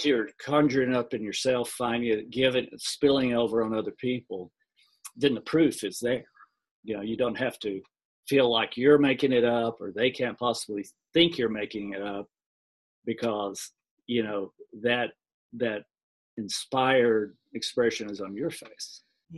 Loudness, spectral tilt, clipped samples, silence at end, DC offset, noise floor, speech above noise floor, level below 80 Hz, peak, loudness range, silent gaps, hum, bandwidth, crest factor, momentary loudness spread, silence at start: -27 LUFS; -4.5 dB/octave; under 0.1%; 0 s; under 0.1%; -51 dBFS; 24 dB; -66 dBFS; -8 dBFS; 7 LU; 6.71-6.83 s, 8.05-8.23 s, 12.46-13.02 s, 13.91-13.97 s, 15.34-15.50 s, 16.03-16.37 s; none; 12.5 kHz; 20 dB; 16 LU; 0 s